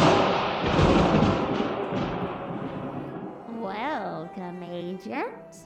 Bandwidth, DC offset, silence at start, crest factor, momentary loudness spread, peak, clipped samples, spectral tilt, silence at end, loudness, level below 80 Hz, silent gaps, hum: 9.6 kHz; under 0.1%; 0 s; 18 dB; 15 LU; -8 dBFS; under 0.1%; -6.5 dB/octave; 0 s; -27 LUFS; -42 dBFS; none; none